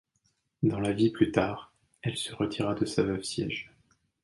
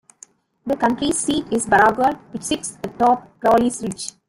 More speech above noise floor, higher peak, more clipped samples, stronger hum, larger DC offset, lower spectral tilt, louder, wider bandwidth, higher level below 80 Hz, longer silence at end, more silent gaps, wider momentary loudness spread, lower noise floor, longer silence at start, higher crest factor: first, 46 dB vs 30 dB; second, -8 dBFS vs -2 dBFS; neither; neither; neither; first, -5.5 dB/octave vs -3.5 dB/octave; second, -30 LUFS vs -19 LUFS; second, 11.5 kHz vs 16 kHz; second, -56 dBFS vs -50 dBFS; first, 0.55 s vs 0.2 s; neither; about the same, 11 LU vs 12 LU; first, -75 dBFS vs -49 dBFS; about the same, 0.6 s vs 0.65 s; about the same, 22 dB vs 18 dB